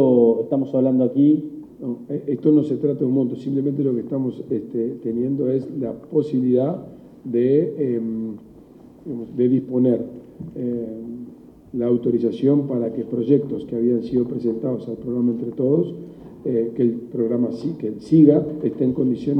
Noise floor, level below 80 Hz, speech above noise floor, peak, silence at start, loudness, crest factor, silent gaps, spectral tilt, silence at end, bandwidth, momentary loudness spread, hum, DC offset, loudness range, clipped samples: -45 dBFS; -58 dBFS; 25 dB; -2 dBFS; 0 s; -21 LUFS; 18 dB; none; -11 dB/octave; 0 s; 5.8 kHz; 14 LU; none; under 0.1%; 3 LU; under 0.1%